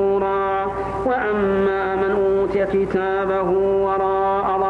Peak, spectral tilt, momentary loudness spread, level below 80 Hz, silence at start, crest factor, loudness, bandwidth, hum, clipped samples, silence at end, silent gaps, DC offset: -8 dBFS; -8 dB/octave; 3 LU; -42 dBFS; 0 s; 10 dB; -20 LUFS; 4.7 kHz; none; under 0.1%; 0 s; none; under 0.1%